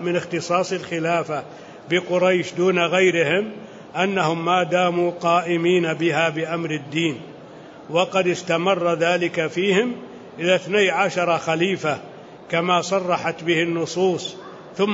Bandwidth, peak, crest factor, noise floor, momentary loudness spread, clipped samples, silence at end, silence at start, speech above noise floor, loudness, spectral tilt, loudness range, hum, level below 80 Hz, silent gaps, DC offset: 8 kHz; -6 dBFS; 16 dB; -41 dBFS; 13 LU; under 0.1%; 0 s; 0 s; 20 dB; -21 LUFS; -5 dB/octave; 2 LU; none; -68 dBFS; none; under 0.1%